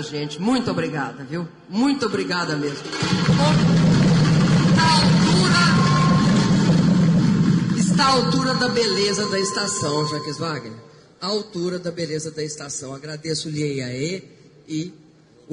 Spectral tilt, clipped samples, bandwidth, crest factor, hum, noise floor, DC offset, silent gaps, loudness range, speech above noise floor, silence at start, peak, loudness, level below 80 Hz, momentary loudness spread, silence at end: -5.5 dB/octave; under 0.1%; 10 kHz; 14 dB; none; -47 dBFS; under 0.1%; none; 12 LU; 25 dB; 0 s; -6 dBFS; -19 LUFS; -44 dBFS; 14 LU; 0 s